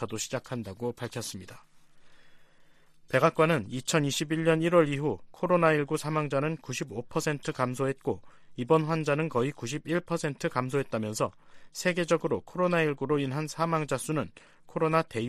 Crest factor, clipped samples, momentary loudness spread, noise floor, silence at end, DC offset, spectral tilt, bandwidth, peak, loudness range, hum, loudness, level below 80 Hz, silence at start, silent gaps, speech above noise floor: 20 dB; under 0.1%; 11 LU; -57 dBFS; 0 s; under 0.1%; -5.5 dB/octave; 15 kHz; -10 dBFS; 4 LU; none; -29 LUFS; -62 dBFS; 0 s; none; 28 dB